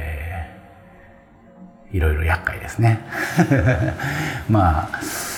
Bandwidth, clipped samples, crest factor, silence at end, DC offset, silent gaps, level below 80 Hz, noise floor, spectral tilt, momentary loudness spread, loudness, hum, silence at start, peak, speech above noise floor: 19.5 kHz; under 0.1%; 18 dB; 0 s; under 0.1%; none; -34 dBFS; -47 dBFS; -6 dB/octave; 12 LU; -21 LUFS; none; 0 s; -2 dBFS; 28 dB